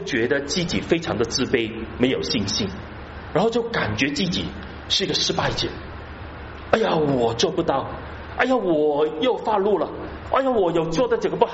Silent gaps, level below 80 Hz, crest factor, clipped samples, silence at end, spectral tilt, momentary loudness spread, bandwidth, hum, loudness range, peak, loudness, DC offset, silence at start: none; -42 dBFS; 20 dB; under 0.1%; 0 s; -3.5 dB/octave; 14 LU; 8 kHz; none; 2 LU; -4 dBFS; -22 LUFS; under 0.1%; 0 s